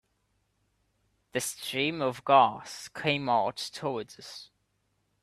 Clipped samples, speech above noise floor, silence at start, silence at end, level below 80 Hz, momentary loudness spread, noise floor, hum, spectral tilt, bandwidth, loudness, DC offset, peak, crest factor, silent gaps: under 0.1%; 47 dB; 1.35 s; 0.8 s; -72 dBFS; 19 LU; -75 dBFS; none; -3.5 dB/octave; 14.5 kHz; -28 LUFS; under 0.1%; -8 dBFS; 22 dB; none